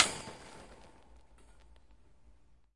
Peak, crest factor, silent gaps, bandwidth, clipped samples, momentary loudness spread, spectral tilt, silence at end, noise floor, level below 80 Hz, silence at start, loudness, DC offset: -6 dBFS; 34 dB; none; 11.5 kHz; under 0.1%; 24 LU; -1 dB/octave; 2 s; -64 dBFS; -62 dBFS; 0 s; -36 LUFS; under 0.1%